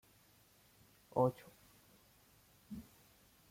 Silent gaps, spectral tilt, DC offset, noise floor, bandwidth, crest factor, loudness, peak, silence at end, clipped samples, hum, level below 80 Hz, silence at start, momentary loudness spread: none; -8 dB/octave; under 0.1%; -68 dBFS; 16.5 kHz; 26 dB; -40 LUFS; -20 dBFS; 0.7 s; under 0.1%; none; -74 dBFS; 1.15 s; 28 LU